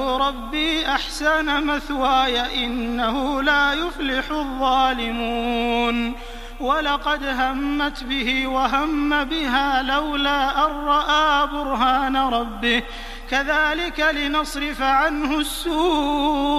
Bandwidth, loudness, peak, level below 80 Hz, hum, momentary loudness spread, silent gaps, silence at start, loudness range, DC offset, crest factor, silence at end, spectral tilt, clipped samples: 15.5 kHz; -21 LUFS; -4 dBFS; -36 dBFS; none; 5 LU; none; 0 s; 3 LU; under 0.1%; 16 dB; 0 s; -3 dB/octave; under 0.1%